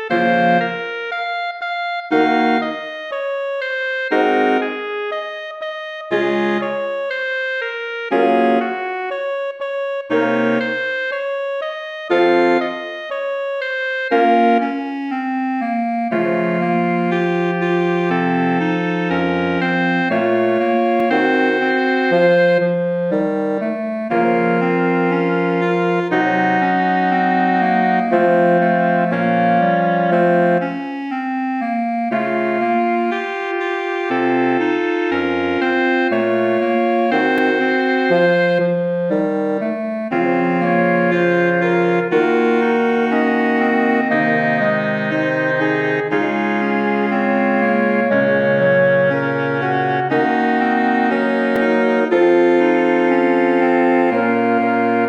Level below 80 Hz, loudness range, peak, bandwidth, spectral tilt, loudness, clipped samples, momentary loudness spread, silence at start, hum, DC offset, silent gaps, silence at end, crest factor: -66 dBFS; 4 LU; -4 dBFS; 7.4 kHz; -7.5 dB/octave; -17 LUFS; under 0.1%; 8 LU; 0 s; none; under 0.1%; none; 0 s; 14 dB